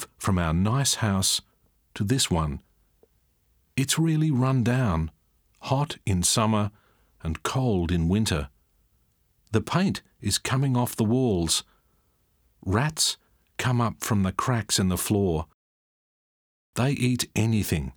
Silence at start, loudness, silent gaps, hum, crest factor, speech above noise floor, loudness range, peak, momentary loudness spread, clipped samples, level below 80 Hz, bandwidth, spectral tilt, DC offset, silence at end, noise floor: 0 s; -25 LUFS; 15.54-16.73 s; none; 20 dB; 43 dB; 2 LU; -8 dBFS; 10 LU; under 0.1%; -44 dBFS; over 20 kHz; -4.5 dB/octave; under 0.1%; 0.05 s; -67 dBFS